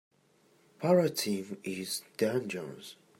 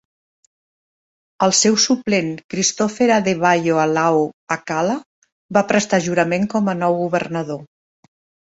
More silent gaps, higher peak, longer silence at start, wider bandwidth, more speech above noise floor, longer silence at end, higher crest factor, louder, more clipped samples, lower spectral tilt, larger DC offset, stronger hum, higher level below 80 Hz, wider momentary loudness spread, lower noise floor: second, none vs 2.44-2.49 s, 4.34-4.47 s, 5.06-5.22 s, 5.32-5.49 s; second, -14 dBFS vs -2 dBFS; second, 0.8 s vs 1.4 s; first, 16 kHz vs 8.2 kHz; second, 35 dB vs over 72 dB; second, 0.25 s vs 0.85 s; about the same, 20 dB vs 18 dB; second, -32 LUFS vs -18 LUFS; neither; about the same, -5 dB/octave vs -4 dB/octave; neither; neither; second, -80 dBFS vs -60 dBFS; first, 13 LU vs 10 LU; second, -67 dBFS vs under -90 dBFS